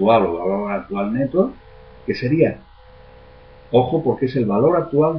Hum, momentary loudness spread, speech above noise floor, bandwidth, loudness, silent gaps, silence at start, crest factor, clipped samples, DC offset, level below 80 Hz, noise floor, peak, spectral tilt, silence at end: none; 8 LU; 26 dB; 5.6 kHz; -19 LUFS; none; 0 s; 18 dB; under 0.1%; under 0.1%; -48 dBFS; -44 dBFS; -2 dBFS; -10 dB/octave; 0 s